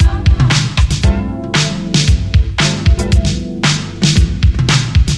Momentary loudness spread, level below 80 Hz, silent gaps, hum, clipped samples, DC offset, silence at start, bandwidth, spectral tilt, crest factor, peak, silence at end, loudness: 3 LU; -16 dBFS; none; none; under 0.1%; under 0.1%; 0 s; 11.5 kHz; -4.5 dB/octave; 12 dB; 0 dBFS; 0 s; -13 LUFS